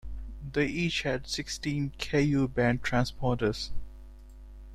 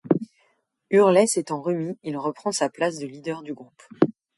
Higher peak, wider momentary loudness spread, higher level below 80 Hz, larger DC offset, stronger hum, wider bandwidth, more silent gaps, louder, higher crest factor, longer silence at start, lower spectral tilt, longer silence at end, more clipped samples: second, -10 dBFS vs -4 dBFS; second, 13 LU vs 16 LU; first, -44 dBFS vs -72 dBFS; neither; neither; first, 14 kHz vs 11.5 kHz; neither; second, -30 LUFS vs -24 LUFS; about the same, 20 dB vs 20 dB; about the same, 0.05 s vs 0.05 s; about the same, -5.5 dB/octave vs -5 dB/octave; second, 0 s vs 0.25 s; neither